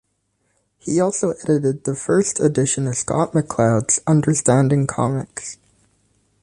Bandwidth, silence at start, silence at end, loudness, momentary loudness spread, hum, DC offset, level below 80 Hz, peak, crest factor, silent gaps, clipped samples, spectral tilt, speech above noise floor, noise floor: 11 kHz; 0.85 s; 0.9 s; -19 LUFS; 8 LU; none; under 0.1%; -52 dBFS; -2 dBFS; 16 dB; none; under 0.1%; -6 dB/octave; 50 dB; -68 dBFS